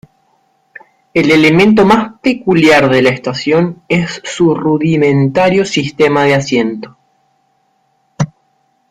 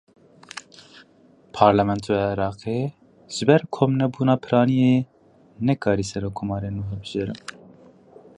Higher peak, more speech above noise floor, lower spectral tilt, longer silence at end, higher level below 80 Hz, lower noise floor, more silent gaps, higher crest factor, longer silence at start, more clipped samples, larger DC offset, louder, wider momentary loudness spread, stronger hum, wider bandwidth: about the same, 0 dBFS vs -2 dBFS; first, 48 dB vs 33 dB; about the same, -6 dB/octave vs -7 dB/octave; second, 0.65 s vs 1 s; about the same, -46 dBFS vs -50 dBFS; first, -59 dBFS vs -55 dBFS; neither; second, 12 dB vs 22 dB; first, 1.15 s vs 0.55 s; neither; neither; first, -11 LUFS vs -22 LUFS; second, 11 LU vs 19 LU; neither; first, 14 kHz vs 10.5 kHz